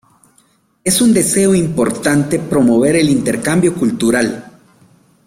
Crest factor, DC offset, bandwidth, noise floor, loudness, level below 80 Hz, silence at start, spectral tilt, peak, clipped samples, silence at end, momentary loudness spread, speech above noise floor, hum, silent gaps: 14 dB; under 0.1%; 16.5 kHz; -55 dBFS; -13 LUFS; -46 dBFS; 0.85 s; -5 dB/octave; -2 dBFS; under 0.1%; 0.75 s; 5 LU; 42 dB; none; none